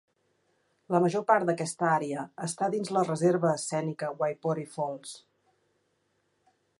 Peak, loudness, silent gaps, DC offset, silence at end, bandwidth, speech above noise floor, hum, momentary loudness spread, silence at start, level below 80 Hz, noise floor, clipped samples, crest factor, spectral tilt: -10 dBFS; -29 LUFS; none; under 0.1%; 1.6 s; 11.5 kHz; 46 dB; none; 10 LU; 0.9 s; -78 dBFS; -74 dBFS; under 0.1%; 20 dB; -5.5 dB/octave